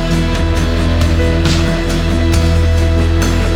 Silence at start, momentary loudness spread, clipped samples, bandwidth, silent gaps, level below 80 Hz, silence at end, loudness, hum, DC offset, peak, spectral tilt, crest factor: 0 s; 2 LU; under 0.1%; 13 kHz; none; -16 dBFS; 0 s; -14 LUFS; none; under 0.1%; 0 dBFS; -6 dB/octave; 10 dB